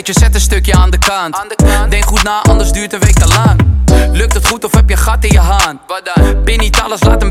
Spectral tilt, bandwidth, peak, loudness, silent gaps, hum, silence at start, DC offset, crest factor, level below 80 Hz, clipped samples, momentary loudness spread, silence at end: -4.5 dB/octave; 16 kHz; 0 dBFS; -10 LUFS; none; none; 0 s; under 0.1%; 8 dB; -10 dBFS; under 0.1%; 4 LU; 0 s